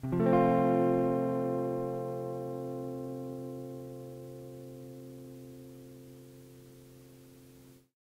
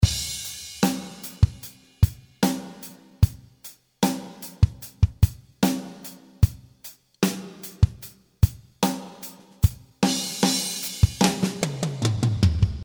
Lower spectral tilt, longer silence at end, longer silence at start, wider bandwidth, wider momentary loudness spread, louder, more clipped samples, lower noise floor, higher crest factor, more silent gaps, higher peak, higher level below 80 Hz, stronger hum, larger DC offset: first, -9 dB/octave vs -5 dB/octave; first, 0.25 s vs 0 s; about the same, 0 s vs 0 s; second, 16 kHz vs over 20 kHz; first, 26 LU vs 19 LU; second, -32 LUFS vs -25 LUFS; neither; first, -57 dBFS vs -48 dBFS; about the same, 20 dB vs 20 dB; neither; second, -14 dBFS vs -4 dBFS; second, -66 dBFS vs -32 dBFS; neither; neither